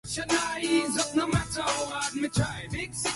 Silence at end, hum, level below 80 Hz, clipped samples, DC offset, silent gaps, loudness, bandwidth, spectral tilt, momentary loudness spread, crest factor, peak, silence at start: 0 s; none; -48 dBFS; under 0.1%; under 0.1%; none; -28 LUFS; 11.5 kHz; -3.5 dB/octave; 5 LU; 16 dB; -12 dBFS; 0.05 s